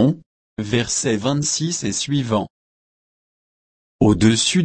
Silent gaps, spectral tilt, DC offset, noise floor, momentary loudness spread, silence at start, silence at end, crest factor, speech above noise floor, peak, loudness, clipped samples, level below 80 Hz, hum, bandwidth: 0.26-0.57 s, 2.50-3.99 s; -4.5 dB/octave; under 0.1%; under -90 dBFS; 16 LU; 0 s; 0 s; 16 dB; over 71 dB; -4 dBFS; -19 LUFS; under 0.1%; -44 dBFS; none; 8.8 kHz